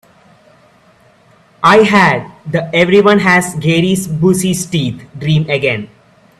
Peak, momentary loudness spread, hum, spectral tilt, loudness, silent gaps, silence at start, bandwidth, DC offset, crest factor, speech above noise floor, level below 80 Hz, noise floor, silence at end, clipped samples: 0 dBFS; 11 LU; none; -5 dB/octave; -12 LUFS; none; 1.6 s; 14 kHz; under 0.1%; 14 dB; 36 dB; -48 dBFS; -48 dBFS; 0.55 s; under 0.1%